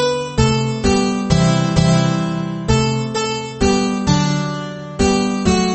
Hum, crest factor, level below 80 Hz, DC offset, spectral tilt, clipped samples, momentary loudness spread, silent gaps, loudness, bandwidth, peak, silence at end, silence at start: none; 14 dB; -30 dBFS; under 0.1%; -5.5 dB/octave; under 0.1%; 7 LU; none; -17 LUFS; 8.8 kHz; -2 dBFS; 0 s; 0 s